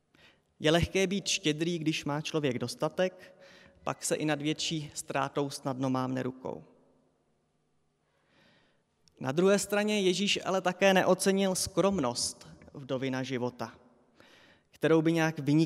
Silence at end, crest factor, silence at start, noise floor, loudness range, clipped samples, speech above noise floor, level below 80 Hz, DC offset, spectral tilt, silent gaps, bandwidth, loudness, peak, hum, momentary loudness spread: 0 s; 20 dB; 0.6 s; -74 dBFS; 9 LU; under 0.1%; 45 dB; -58 dBFS; under 0.1%; -4.5 dB/octave; none; 16 kHz; -30 LUFS; -12 dBFS; none; 12 LU